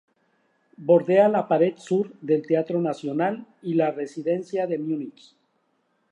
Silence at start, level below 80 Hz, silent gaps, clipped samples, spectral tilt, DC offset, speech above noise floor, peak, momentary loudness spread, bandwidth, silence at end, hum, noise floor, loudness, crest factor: 0.8 s; -80 dBFS; none; under 0.1%; -8 dB/octave; under 0.1%; 47 dB; -6 dBFS; 11 LU; 9.8 kHz; 1 s; none; -70 dBFS; -24 LUFS; 18 dB